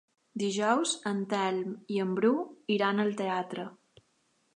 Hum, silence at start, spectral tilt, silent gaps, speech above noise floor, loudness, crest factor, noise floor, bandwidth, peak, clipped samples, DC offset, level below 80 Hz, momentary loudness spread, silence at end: none; 0.35 s; -4.5 dB/octave; none; 43 dB; -30 LUFS; 18 dB; -72 dBFS; 11 kHz; -12 dBFS; under 0.1%; under 0.1%; -82 dBFS; 9 LU; 0.8 s